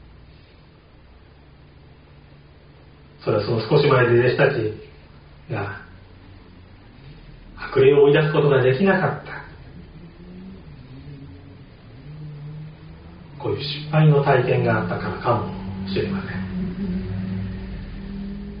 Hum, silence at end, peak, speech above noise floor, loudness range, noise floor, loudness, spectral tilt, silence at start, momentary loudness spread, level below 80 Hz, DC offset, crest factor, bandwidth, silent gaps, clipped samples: none; 0 s; -4 dBFS; 31 dB; 17 LU; -49 dBFS; -20 LUFS; -6 dB/octave; 3.2 s; 26 LU; -44 dBFS; under 0.1%; 20 dB; 5.2 kHz; none; under 0.1%